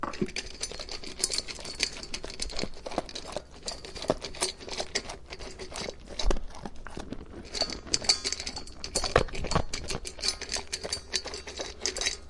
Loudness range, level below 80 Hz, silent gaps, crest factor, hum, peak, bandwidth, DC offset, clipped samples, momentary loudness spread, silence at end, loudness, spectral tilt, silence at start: 6 LU; -42 dBFS; none; 30 dB; none; -4 dBFS; 11.5 kHz; under 0.1%; under 0.1%; 13 LU; 0 s; -32 LUFS; -2 dB/octave; 0 s